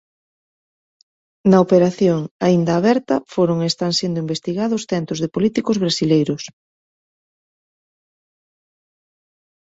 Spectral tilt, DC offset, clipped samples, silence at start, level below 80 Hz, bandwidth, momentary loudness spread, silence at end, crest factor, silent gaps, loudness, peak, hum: -6 dB/octave; under 0.1%; under 0.1%; 1.45 s; -58 dBFS; 8 kHz; 8 LU; 3.2 s; 18 dB; 2.31-2.40 s; -18 LUFS; -2 dBFS; none